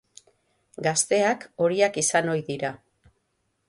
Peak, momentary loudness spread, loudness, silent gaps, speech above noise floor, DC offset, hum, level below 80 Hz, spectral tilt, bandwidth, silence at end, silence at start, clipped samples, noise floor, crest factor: -8 dBFS; 9 LU; -24 LUFS; none; 50 dB; under 0.1%; none; -68 dBFS; -3 dB/octave; 11.5 kHz; 0.95 s; 0.8 s; under 0.1%; -74 dBFS; 18 dB